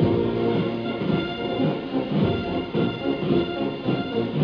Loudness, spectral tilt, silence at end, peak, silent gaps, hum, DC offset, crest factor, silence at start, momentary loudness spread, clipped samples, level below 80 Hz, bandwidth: -25 LUFS; -9 dB/octave; 0 s; -8 dBFS; none; none; under 0.1%; 16 dB; 0 s; 4 LU; under 0.1%; -48 dBFS; 5.4 kHz